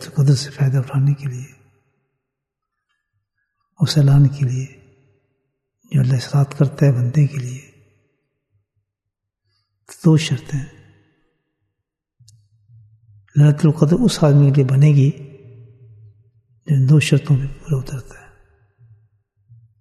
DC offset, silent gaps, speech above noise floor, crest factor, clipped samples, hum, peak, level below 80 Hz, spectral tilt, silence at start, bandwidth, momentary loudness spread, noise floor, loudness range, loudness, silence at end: under 0.1%; none; 66 dB; 18 dB; under 0.1%; none; 0 dBFS; -46 dBFS; -7 dB/octave; 0 s; 12 kHz; 17 LU; -81 dBFS; 8 LU; -16 LUFS; 1.8 s